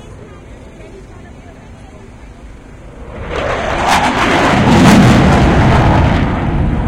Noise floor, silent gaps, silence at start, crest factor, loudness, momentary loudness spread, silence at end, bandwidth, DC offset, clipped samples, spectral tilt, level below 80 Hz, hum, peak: -34 dBFS; none; 0.05 s; 12 dB; -10 LUFS; 12 LU; 0 s; 16.5 kHz; under 0.1%; 0.2%; -6 dB/octave; -22 dBFS; none; 0 dBFS